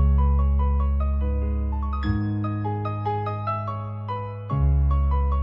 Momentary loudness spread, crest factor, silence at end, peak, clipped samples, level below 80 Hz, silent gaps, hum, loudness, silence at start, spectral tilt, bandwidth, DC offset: 9 LU; 10 dB; 0 s; -12 dBFS; under 0.1%; -24 dBFS; none; none; -25 LUFS; 0 s; -11 dB/octave; 5.4 kHz; under 0.1%